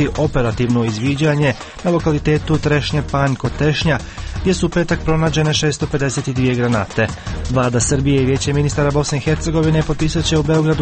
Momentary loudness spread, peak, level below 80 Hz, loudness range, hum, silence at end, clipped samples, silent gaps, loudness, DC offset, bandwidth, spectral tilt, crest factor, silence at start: 4 LU; -2 dBFS; -30 dBFS; 1 LU; none; 0 s; under 0.1%; none; -17 LUFS; under 0.1%; 8.8 kHz; -5.5 dB/octave; 14 dB; 0 s